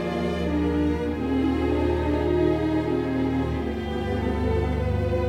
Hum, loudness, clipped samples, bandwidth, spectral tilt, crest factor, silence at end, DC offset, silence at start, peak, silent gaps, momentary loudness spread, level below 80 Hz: none; -25 LUFS; under 0.1%; 10.5 kHz; -8.5 dB/octave; 14 dB; 0 s; under 0.1%; 0 s; -10 dBFS; none; 4 LU; -32 dBFS